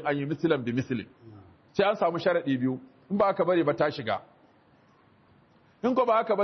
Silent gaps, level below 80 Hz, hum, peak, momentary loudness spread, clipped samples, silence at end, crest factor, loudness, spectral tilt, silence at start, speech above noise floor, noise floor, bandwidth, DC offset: none; -68 dBFS; none; -12 dBFS; 10 LU; under 0.1%; 0 s; 16 dB; -27 LUFS; -7.5 dB/octave; 0 s; 34 dB; -61 dBFS; 6.4 kHz; under 0.1%